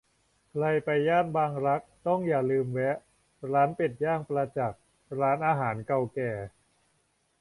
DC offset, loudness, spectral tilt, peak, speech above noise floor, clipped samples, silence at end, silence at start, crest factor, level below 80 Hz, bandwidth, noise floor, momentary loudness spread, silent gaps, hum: under 0.1%; -29 LUFS; -8 dB/octave; -12 dBFS; 44 dB; under 0.1%; 0.9 s; 0.55 s; 16 dB; -64 dBFS; 11.5 kHz; -72 dBFS; 9 LU; none; none